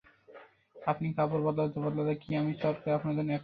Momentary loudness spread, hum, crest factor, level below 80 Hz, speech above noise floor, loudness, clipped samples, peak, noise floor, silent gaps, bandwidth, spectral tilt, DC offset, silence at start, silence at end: 3 LU; none; 18 dB; -66 dBFS; 24 dB; -32 LUFS; under 0.1%; -14 dBFS; -55 dBFS; none; 5 kHz; -10.5 dB/octave; under 0.1%; 0.3 s; 0 s